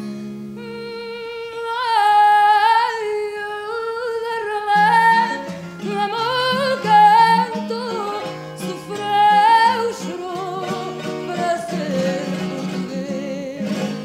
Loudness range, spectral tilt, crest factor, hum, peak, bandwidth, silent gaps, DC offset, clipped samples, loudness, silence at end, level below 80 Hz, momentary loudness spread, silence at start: 8 LU; -4.5 dB/octave; 16 dB; none; -2 dBFS; 15 kHz; none; under 0.1%; under 0.1%; -18 LUFS; 0 s; -64 dBFS; 17 LU; 0 s